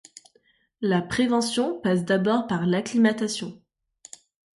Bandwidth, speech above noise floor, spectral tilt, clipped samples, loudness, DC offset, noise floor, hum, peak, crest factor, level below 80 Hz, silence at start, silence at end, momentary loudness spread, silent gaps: 11.5 kHz; 41 dB; -5.5 dB/octave; under 0.1%; -24 LUFS; under 0.1%; -65 dBFS; none; -8 dBFS; 16 dB; -62 dBFS; 0.8 s; 1 s; 15 LU; none